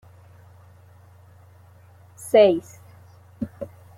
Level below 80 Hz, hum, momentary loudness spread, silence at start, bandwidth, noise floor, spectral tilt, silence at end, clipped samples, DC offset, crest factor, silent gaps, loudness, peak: -64 dBFS; none; 22 LU; 2.2 s; 15 kHz; -50 dBFS; -5.5 dB/octave; 0.3 s; under 0.1%; under 0.1%; 22 dB; none; -20 LUFS; -4 dBFS